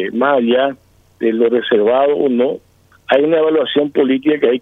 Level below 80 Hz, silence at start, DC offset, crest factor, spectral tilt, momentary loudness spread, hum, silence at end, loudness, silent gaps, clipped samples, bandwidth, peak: -62 dBFS; 0 s; under 0.1%; 14 dB; -7.5 dB/octave; 6 LU; none; 0 s; -14 LUFS; none; under 0.1%; 4 kHz; 0 dBFS